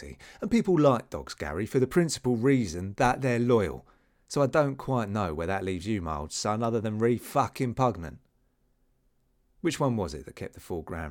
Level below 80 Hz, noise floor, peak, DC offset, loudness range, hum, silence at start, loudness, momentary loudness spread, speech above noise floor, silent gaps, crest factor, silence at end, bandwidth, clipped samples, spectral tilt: -50 dBFS; -69 dBFS; -10 dBFS; under 0.1%; 5 LU; none; 0 s; -28 LUFS; 13 LU; 42 dB; none; 18 dB; 0 s; 18 kHz; under 0.1%; -6 dB/octave